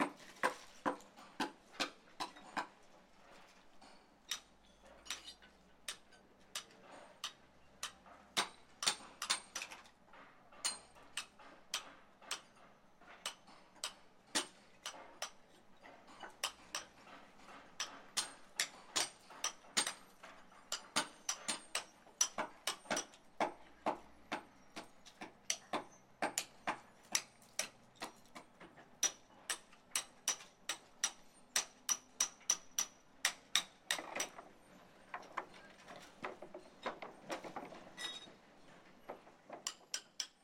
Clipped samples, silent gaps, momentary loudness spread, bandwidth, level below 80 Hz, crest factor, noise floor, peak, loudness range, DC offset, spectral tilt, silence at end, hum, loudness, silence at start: under 0.1%; none; 22 LU; 16 kHz; -78 dBFS; 34 dB; -64 dBFS; -12 dBFS; 10 LU; under 0.1%; 0 dB/octave; 0.15 s; none; -42 LUFS; 0 s